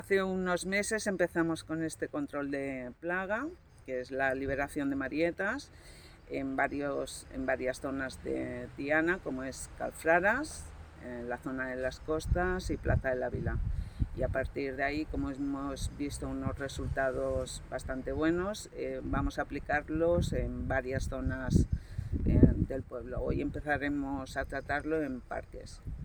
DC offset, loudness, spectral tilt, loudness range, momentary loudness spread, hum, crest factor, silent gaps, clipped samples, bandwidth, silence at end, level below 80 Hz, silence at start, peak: under 0.1%; -34 LUFS; -6 dB/octave; 4 LU; 10 LU; none; 26 dB; none; under 0.1%; over 20 kHz; 0 s; -42 dBFS; 0 s; -6 dBFS